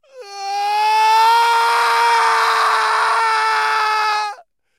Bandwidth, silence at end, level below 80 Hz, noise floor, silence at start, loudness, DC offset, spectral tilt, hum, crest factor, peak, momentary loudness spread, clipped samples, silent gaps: 16 kHz; 0.45 s; -80 dBFS; -35 dBFS; 0.15 s; -15 LUFS; under 0.1%; 2.5 dB/octave; none; 12 dB; -4 dBFS; 9 LU; under 0.1%; none